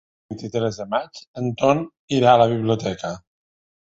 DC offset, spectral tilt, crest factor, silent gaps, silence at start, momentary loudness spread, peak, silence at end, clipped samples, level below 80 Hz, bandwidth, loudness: under 0.1%; -6.5 dB/octave; 20 dB; 1.27-1.34 s, 1.99-2.08 s; 0.3 s; 18 LU; 0 dBFS; 0.7 s; under 0.1%; -56 dBFS; 8 kHz; -21 LUFS